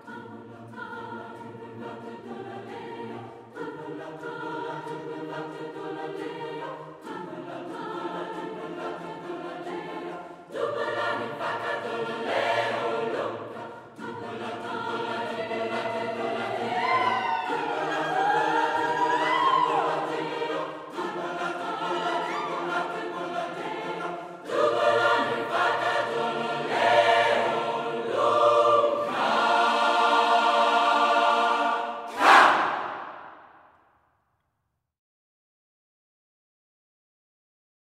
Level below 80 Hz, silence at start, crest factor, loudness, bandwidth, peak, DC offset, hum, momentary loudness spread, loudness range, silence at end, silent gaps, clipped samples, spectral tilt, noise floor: -78 dBFS; 0.05 s; 24 dB; -26 LUFS; 15.5 kHz; -4 dBFS; under 0.1%; none; 18 LU; 15 LU; 4.35 s; none; under 0.1%; -4 dB/octave; -79 dBFS